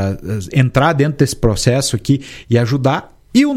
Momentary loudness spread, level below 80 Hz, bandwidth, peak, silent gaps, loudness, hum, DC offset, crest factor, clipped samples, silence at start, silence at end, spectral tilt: 6 LU; -34 dBFS; 15 kHz; 0 dBFS; none; -16 LUFS; none; under 0.1%; 14 dB; under 0.1%; 0 s; 0 s; -6 dB/octave